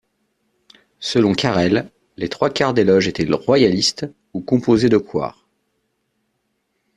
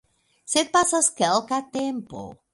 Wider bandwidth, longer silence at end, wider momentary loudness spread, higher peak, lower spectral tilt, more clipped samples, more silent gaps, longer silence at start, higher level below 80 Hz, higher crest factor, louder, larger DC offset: about the same, 11 kHz vs 12 kHz; first, 1.65 s vs 0.2 s; about the same, 14 LU vs 15 LU; first, -2 dBFS vs -6 dBFS; first, -5.5 dB/octave vs -2 dB/octave; neither; neither; first, 1 s vs 0.5 s; first, -52 dBFS vs -62 dBFS; about the same, 18 dB vs 20 dB; first, -17 LUFS vs -22 LUFS; neither